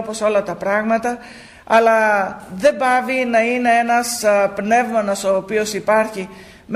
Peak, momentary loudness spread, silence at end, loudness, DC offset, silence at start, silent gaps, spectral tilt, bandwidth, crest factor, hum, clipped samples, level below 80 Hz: -2 dBFS; 6 LU; 0 s; -17 LUFS; under 0.1%; 0 s; none; -4 dB/octave; 15.5 kHz; 14 dB; none; under 0.1%; -54 dBFS